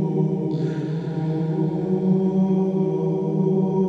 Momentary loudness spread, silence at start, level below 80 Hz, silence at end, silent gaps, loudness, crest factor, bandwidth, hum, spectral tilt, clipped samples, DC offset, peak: 5 LU; 0 s; -58 dBFS; 0 s; none; -22 LUFS; 12 dB; 6 kHz; none; -10.5 dB/octave; under 0.1%; under 0.1%; -10 dBFS